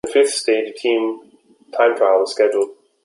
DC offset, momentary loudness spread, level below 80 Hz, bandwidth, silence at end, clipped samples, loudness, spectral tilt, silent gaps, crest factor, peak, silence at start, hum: under 0.1%; 10 LU; -64 dBFS; 11.5 kHz; 0.3 s; under 0.1%; -18 LUFS; -2 dB/octave; none; 16 dB; -2 dBFS; 0.05 s; none